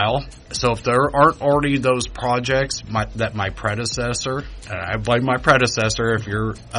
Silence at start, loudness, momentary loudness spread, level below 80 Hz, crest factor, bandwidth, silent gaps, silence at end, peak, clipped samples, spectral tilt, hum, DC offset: 0 s; -20 LUFS; 10 LU; -38 dBFS; 18 dB; 11 kHz; none; 0 s; -2 dBFS; under 0.1%; -4.5 dB/octave; none; under 0.1%